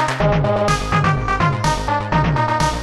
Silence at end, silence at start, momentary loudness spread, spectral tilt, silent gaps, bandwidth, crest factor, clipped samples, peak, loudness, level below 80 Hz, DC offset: 0 s; 0 s; 2 LU; -5.5 dB/octave; none; 13 kHz; 12 dB; under 0.1%; -4 dBFS; -18 LUFS; -28 dBFS; under 0.1%